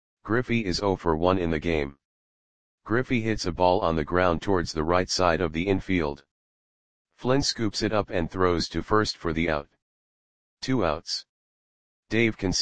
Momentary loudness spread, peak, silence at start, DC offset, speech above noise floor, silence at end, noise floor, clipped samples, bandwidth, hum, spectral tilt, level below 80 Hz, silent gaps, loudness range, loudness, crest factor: 6 LU; -6 dBFS; 0.15 s; 0.9%; over 65 dB; 0 s; under -90 dBFS; under 0.1%; 9.8 kHz; none; -5 dB/octave; -44 dBFS; 2.05-2.78 s, 6.31-7.05 s, 9.82-10.57 s, 11.29-12.03 s; 4 LU; -26 LUFS; 20 dB